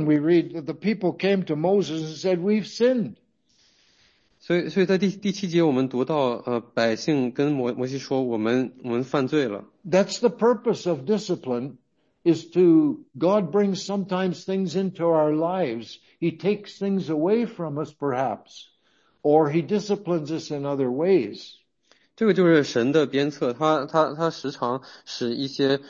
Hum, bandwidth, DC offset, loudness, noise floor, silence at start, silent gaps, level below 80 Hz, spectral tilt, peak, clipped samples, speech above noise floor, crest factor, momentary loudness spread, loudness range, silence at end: none; 7.6 kHz; under 0.1%; -24 LUFS; -65 dBFS; 0 s; none; -72 dBFS; -6.5 dB/octave; -6 dBFS; under 0.1%; 42 dB; 18 dB; 9 LU; 3 LU; 0 s